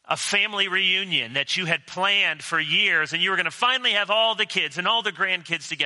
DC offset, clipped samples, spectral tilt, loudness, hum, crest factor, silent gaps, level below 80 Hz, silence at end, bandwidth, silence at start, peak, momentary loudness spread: under 0.1%; under 0.1%; -1.5 dB/octave; -21 LUFS; none; 20 dB; none; -76 dBFS; 0 s; 11.5 kHz; 0.1 s; -4 dBFS; 4 LU